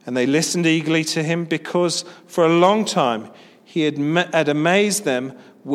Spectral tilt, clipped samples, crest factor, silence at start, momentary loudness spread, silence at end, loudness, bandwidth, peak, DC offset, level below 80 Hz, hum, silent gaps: -4.5 dB/octave; under 0.1%; 18 dB; 0.05 s; 10 LU; 0 s; -19 LUFS; 15 kHz; -2 dBFS; under 0.1%; -72 dBFS; none; none